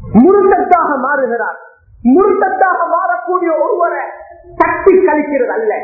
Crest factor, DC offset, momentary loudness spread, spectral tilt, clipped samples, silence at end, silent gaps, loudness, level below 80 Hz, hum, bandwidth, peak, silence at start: 12 dB; under 0.1%; 9 LU; -11 dB/octave; 0.1%; 0 s; none; -12 LUFS; -42 dBFS; none; 2.9 kHz; 0 dBFS; 0 s